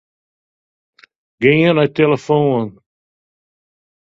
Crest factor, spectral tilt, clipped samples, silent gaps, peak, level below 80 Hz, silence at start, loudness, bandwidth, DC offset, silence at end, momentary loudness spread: 18 dB; -7.5 dB/octave; under 0.1%; none; 0 dBFS; -56 dBFS; 1.4 s; -14 LUFS; 7.6 kHz; under 0.1%; 1.35 s; 7 LU